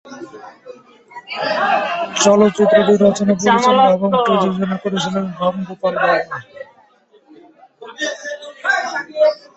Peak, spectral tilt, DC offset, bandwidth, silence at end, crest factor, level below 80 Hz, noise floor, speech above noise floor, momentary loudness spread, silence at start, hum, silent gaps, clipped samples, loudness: 0 dBFS; -4.5 dB/octave; under 0.1%; 8.2 kHz; 0.2 s; 16 dB; -58 dBFS; -52 dBFS; 38 dB; 17 LU; 0.05 s; none; none; under 0.1%; -16 LUFS